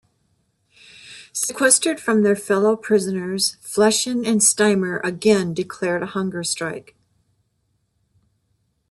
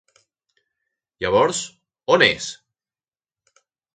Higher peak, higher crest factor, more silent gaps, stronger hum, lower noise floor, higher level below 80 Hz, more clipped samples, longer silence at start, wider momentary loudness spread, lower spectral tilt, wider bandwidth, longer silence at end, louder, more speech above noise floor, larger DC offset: about the same, 0 dBFS vs -2 dBFS; about the same, 22 dB vs 24 dB; neither; neither; second, -69 dBFS vs under -90 dBFS; second, -64 dBFS vs -56 dBFS; neither; second, 1.05 s vs 1.2 s; second, 11 LU vs 17 LU; about the same, -3 dB/octave vs -3 dB/octave; first, 12.5 kHz vs 9.4 kHz; first, 2.1 s vs 1.4 s; about the same, -19 LUFS vs -19 LUFS; second, 49 dB vs over 71 dB; neither